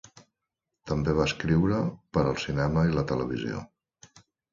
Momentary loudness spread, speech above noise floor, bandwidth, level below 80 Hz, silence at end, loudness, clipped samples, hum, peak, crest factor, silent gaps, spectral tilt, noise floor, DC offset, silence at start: 8 LU; 59 dB; 7.6 kHz; -44 dBFS; 0.85 s; -27 LUFS; under 0.1%; none; -10 dBFS; 18 dB; none; -7 dB/octave; -85 dBFS; under 0.1%; 0.15 s